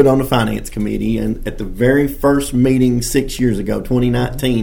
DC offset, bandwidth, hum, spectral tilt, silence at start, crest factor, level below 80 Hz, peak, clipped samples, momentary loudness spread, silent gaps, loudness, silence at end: under 0.1%; 17.5 kHz; none; -6 dB/octave; 0 s; 16 dB; -28 dBFS; 0 dBFS; under 0.1%; 8 LU; none; -16 LUFS; 0 s